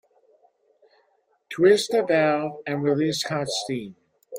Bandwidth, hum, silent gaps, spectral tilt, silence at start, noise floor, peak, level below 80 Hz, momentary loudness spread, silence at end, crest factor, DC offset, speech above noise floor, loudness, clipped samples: 16 kHz; none; none; -4.5 dB/octave; 1.5 s; -67 dBFS; -6 dBFS; -68 dBFS; 13 LU; 0 s; 18 dB; under 0.1%; 45 dB; -23 LUFS; under 0.1%